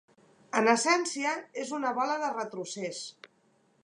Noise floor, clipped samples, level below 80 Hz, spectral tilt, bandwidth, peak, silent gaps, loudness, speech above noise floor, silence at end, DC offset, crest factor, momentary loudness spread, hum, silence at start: -68 dBFS; under 0.1%; -88 dBFS; -2.5 dB/octave; 11.5 kHz; -8 dBFS; none; -29 LUFS; 38 dB; 0.6 s; under 0.1%; 24 dB; 12 LU; none; 0.55 s